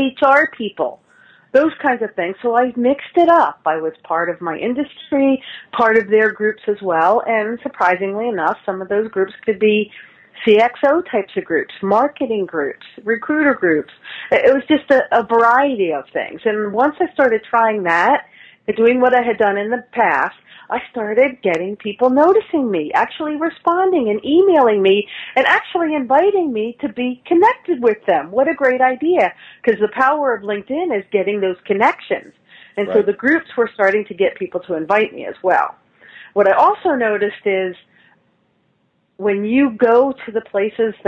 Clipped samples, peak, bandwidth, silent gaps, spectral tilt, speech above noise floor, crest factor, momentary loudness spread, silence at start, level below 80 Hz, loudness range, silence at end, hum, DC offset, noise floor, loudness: under 0.1%; 0 dBFS; 7.8 kHz; none; -6.5 dB/octave; 47 dB; 16 dB; 10 LU; 0 s; -60 dBFS; 3 LU; 0.15 s; none; under 0.1%; -63 dBFS; -16 LUFS